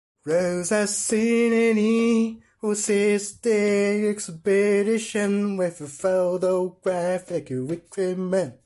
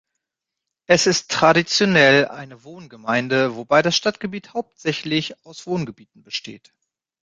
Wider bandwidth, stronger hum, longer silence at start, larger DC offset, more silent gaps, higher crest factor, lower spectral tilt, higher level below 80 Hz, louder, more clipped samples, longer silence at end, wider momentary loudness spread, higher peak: first, 11.5 kHz vs 9.4 kHz; neither; second, 0.25 s vs 0.9 s; neither; neither; second, 12 dB vs 20 dB; about the same, -5 dB/octave vs -4 dB/octave; second, -66 dBFS vs -60 dBFS; second, -23 LUFS vs -19 LUFS; neither; second, 0.15 s vs 0.65 s; second, 8 LU vs 18 LU; second, -12 dBFS vs -2 dBFS